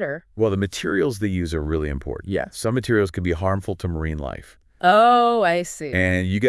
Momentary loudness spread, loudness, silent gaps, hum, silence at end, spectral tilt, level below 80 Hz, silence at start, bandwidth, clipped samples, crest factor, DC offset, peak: 13 LU; -21 LUFS; none; none; 0 s; -6 dB/octave; -40 dBFS; 0 s; 12 kHz; under 0.1%; 18 dB; under 0.1%; -2 dBFS